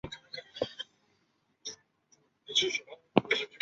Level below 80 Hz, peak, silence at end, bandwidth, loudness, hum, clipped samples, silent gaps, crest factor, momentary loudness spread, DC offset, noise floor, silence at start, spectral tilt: -68 dBFS; -4 dBFS; 0.05 s; 8 kHz; -32 LUFS; none; under 0.1%; none; 32 dB; 16 LU; under 0.1%; -74 dBFS; 0.05 s; -1.5 dB/octave